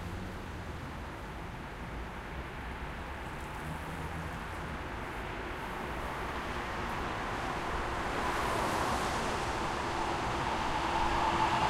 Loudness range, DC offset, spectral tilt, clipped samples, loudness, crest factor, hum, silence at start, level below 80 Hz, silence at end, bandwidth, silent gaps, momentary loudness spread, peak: 9 LU; under 0.1%; -4.5 dB/octave; under 0.1%; -36 LUFS; 18 dB; none; 0 s; -44 dBFS; 0 s; 16 kHz; none; 10 LU; -18 dBFS